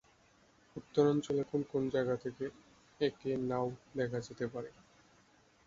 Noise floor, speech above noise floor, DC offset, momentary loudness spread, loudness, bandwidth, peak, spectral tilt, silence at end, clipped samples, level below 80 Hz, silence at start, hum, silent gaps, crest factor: -67 dBFS; 32 dB; under 0.1%; 13 LU; -36 LUFS; 7.6 kHz; -16 dBFS; -6.5 dB/octave; 0.95 s; under 0.1%; -70 dBFS; 0.75 s; none; none; 22 dB